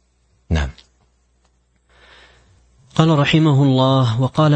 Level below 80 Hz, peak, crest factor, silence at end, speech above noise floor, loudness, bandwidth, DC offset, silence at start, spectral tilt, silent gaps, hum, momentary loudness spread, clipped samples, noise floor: -36 dBFS; 0 dBFS; 18 dB; 0 s; 47 dB; -16 LUFS; 8.6 kHz; under 0.1%; 0.5 s; -7 dB/octave; none; 60 Hz at -50 dBFS; 10 LU; under 0.1%; -61 dBFS